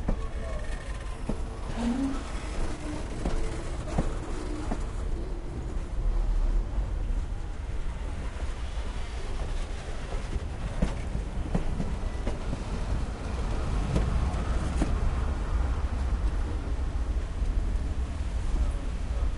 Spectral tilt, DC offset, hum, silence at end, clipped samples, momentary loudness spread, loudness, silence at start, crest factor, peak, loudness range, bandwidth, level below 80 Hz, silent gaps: -6.5 dB/octave; under 0.1%; none; 0 s; under 0.1%; 7 LU; -33 LUFS; 0 s; 18 dB; -12 dBFS; 5 LU; 11.5 kHz; -30 dBFS; none